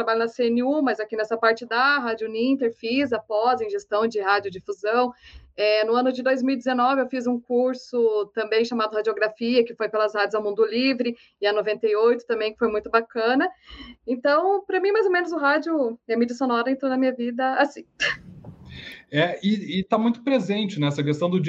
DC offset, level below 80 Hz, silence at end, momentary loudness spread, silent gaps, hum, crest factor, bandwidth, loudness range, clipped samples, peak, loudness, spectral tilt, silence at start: under 0.1%; -62 dBFS; 0 s; 6 LU; none; none; 18 dB; 7.8 kHz; 2 LU; under 0.1%; -4 dBFS; -23 LUFS; -6 dB/octave; 0 s